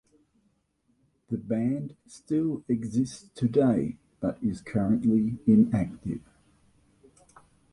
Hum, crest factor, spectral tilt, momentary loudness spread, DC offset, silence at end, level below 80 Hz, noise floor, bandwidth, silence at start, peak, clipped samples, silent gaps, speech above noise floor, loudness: none; 18 dB; -8.5 dB/octave; 14 LU; under 0.1%; 1.55 s; -56 dBFS; -71 dBFS; 11 kHz; 1.3 s; -10 dBFS; under 0.1%; none; 45 dB; -27 LUFS